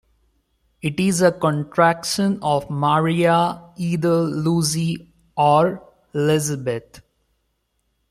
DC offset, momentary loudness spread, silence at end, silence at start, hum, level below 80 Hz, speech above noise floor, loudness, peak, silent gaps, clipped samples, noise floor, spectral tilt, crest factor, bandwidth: under 0.1%; 11 LU; 1.1 s; 0.85 s; none; -56 dBFS; 51 dB; -20 LUFS; -2 dBFS; none; under 0.1%; -70 dBFS; -5.5 dB/octave; 18 dB; 15 kHz